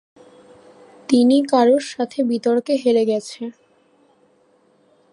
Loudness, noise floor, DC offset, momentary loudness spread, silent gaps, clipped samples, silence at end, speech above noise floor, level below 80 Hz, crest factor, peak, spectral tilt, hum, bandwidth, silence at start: -18 LUFS; -58 dBFS; under 0.1%; 17 LU; none; under 0.1%; 1.6 s; 41 dB; -74 dBFS; 18 dB; -2 dBFS; -5 dB/octave; none; 11.5 kHz; 1.1 s